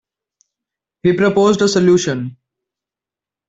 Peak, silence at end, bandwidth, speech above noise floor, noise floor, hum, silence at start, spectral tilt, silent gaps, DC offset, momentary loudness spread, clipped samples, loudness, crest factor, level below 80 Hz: -2 dBFS; 1.15 s; 8 kHz; 75 dB; -88 dBFS; none; 1.05 s; -5.5 dB/octave; none; under 0.1%; 10 LU; under 0.1%; -14 LUFS; 14 dB; -54 dBFS